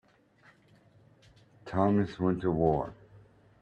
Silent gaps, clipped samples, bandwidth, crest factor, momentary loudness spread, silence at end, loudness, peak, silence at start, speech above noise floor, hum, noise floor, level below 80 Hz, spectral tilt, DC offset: none; under 0.1%; 8 kHz; 20 dB; 12 LU; 0.45 s; -29 LUFS; -12 dBFS; 1.65 s; 34 dB; none; -62 dBFS; -56 dBFS; -9.5 dB/octave; under 0.1%